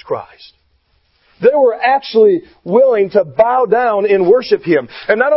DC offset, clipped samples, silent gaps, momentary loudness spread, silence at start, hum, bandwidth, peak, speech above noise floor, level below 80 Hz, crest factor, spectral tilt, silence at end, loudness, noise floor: under 0.1%; under 0.1%; none; 5 LU; 0.05 s; none; 5.8 kHz; 0 dBFS; 46 dB; -56 dBFS; 14 dB; -9.5 dB/octave; 0 s; -13 LUFS; -58 dBFS